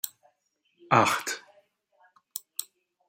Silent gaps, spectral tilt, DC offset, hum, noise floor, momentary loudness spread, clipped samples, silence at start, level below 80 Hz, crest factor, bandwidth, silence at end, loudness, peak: none; -3.5 dB/octave; under 0.1%; none; -74 dBFS; 17 LU; under 0.1%; 0.05 s; -76 dBFS; 26 dB; 16.5 kHz; 0.45 s; -27 LUFS; -4 dBFS